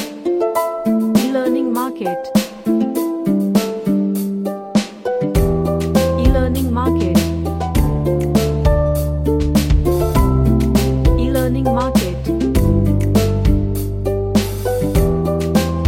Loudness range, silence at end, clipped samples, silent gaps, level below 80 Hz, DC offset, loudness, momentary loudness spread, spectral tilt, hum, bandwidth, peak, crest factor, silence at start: 2 LU; 0 s; under 0.1%; none; -22 dBFS; under 0.1%; -17 LUFS; 5 LU; -7 dB/octave; none; 17 kHz; 0 dBFS; 14 dB; 0 s